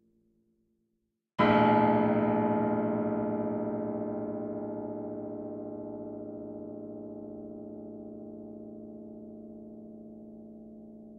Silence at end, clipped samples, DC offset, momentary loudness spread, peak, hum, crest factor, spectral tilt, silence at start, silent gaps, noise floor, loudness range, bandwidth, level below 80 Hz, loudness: 0 s; under 0.1%; under 0.1%; 22 LU; -12 dBFS; none; 22 dB; -9.5 dB/octave; 1.4 s; none; -80 dBFS; 17 LU; 5.4 kHz; -64 dBFS; -30 LUFS